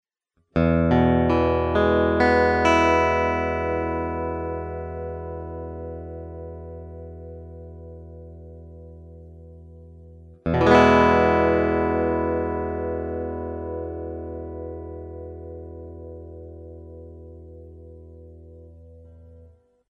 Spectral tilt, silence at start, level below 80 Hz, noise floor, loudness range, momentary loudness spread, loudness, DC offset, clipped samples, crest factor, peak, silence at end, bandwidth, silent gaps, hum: -7 dB/octave; 0.55 s; -40 dBFS; -71 dBFS; 22 LU; 24 LU; -22 LUFS; under 0.1%; under 0.1%; 22 dB; -2 dBFS; 0.5 s; 8.8 kHz; none; none